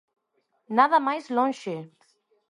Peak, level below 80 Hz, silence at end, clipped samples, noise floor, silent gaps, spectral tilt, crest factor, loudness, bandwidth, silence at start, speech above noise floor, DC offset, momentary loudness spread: -6 dBFS; -82 dBFS; 0.65 s; under 0.1%; -73 dBFS; none; -5.5 dB/octave; 22 dB; -24 LUFS; 11 kHz; 0.7 s; 49 dB; under 0.1%; 15 LU